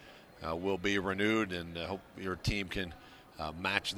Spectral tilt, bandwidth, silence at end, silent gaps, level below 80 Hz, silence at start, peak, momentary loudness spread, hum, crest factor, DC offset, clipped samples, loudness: -4.5 dB/octave; over 20 kHz; 0 s; none; -52 dBFS; 0 s; -12 dBFS; 13 LU; none; 24 dB; under 0.1%; under 0.1%; -35 LUFS